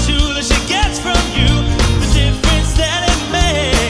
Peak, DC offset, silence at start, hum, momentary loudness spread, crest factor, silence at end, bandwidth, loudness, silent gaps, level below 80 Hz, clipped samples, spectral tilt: 0 dBFS; under 0.1%; 0 s; none; 2 LU; 12 dB; 0 s; 11 kHz; -14 LUFS; none; -16 dBFS; under 0.1%; -4 dB/octave